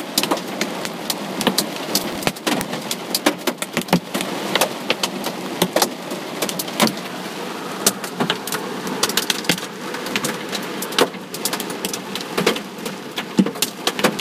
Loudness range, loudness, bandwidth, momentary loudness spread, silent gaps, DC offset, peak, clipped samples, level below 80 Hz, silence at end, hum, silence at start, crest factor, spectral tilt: 1 LU; -22 LUFS; 16 kHz; 7 LU; none; under 0.1%; 0 dBFS; under 0.1%; -60 dBFS; 0 s; none; 0 s; 22 dB; -3 dB/octave